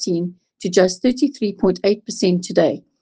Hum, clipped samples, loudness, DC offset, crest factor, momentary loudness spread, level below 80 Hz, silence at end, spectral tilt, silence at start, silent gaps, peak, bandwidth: none; under 0.1%; -19 LUFS; under 0.1%; 18 dB; 6 LU; -56 dBFS; 0.2 s; -5.5 dB/octave; 0 s; none; -2 dBFS; 9.6 kHz